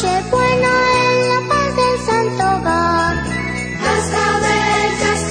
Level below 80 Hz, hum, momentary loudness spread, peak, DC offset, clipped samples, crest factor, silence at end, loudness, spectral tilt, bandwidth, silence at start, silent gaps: -34 dBFS; none; 5 LU; -2 dBFS; under 0.1%; under 0.1%; 12 dB; 0 s; -15 LUFS; -4 dB/octave; 10 kHz; 0 s; none